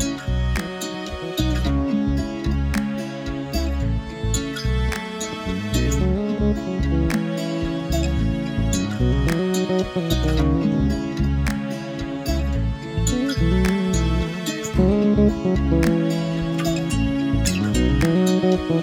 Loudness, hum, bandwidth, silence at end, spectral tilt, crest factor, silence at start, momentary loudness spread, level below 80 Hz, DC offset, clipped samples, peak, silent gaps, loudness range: -22 LUFS; none; 17 kHz; 0 s; -6 dB/octave; 16 dB; 0 s; 8 LU; -26 dBFS; under 0.1%; under 0.1%; -4 dBFS; none; 4 LU